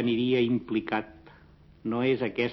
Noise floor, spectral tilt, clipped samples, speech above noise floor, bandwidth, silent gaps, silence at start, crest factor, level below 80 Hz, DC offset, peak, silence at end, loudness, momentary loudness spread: -55 dBFS; -8.5 dB/octave; under 0.1%; 28 dB; 6 kHz; none; 0 s; 14 dB; -60 dBFS; under 0.1%; -14 dBFS; 0 s; -28 LUFS; 10 LU